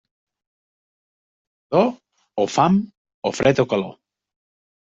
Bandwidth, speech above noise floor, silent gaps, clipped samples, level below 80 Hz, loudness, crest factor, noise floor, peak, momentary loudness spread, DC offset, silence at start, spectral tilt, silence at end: 8 kHz; over 71 dB; 2.97-3.05 s, 3.14-3.22 s; under 0.1%; -58 dBFS; -20 LUFS; 20 dB; under -90 dBFS; -2 dBFS; 13 LU; under 0.1%; 1.7 s; -6 dB/octave; 0.95 s